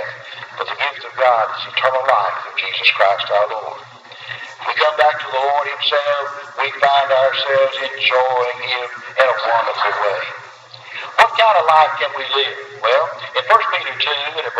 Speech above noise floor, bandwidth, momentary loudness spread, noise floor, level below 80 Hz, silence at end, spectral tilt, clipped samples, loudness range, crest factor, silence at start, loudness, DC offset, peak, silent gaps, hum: 21 dB; 10.5 kHz; 15 LU; -37 dBFS; -70 dBFS; 0 s; -2 dB/octave; under 0.1%; 3 LU; 18 dB; 0 s; -16 LUFS; under 0.1%; 0 dBFS; none; none